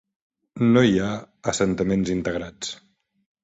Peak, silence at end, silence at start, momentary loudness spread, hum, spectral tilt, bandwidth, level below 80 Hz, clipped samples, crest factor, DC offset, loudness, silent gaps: -4 dBFS; 0.7 s; 0.55 s; 15 LU; none; -5.5 dB/octave; 8.2 kHz; -50 dBFS; under 0.1%; 18 dB; under 0.1%; -23 LUFS; none